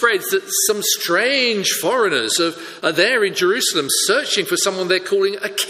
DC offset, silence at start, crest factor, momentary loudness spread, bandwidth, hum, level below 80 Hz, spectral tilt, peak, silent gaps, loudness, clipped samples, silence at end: under 0.1%; 0 s; 18 dB; 4 LU; 15.5 kHz; none; -68 dBFS; -1.5 dB/octave; 0 dBFS; none; -17 LUFS; under 0.1%; 0 s